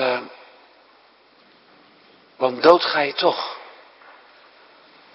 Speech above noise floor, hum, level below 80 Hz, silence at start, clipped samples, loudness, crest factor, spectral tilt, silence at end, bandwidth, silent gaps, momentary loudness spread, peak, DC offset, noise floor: 37 dB; none; -68 dBFS; 0 s; under 0.1%; -19 LUFS; 24 dB; -5.5 dB/octave; 1.45 s; 6.8 kHz; none; 19 LU; 0 dBFS; under 0.1%; -54 dBFS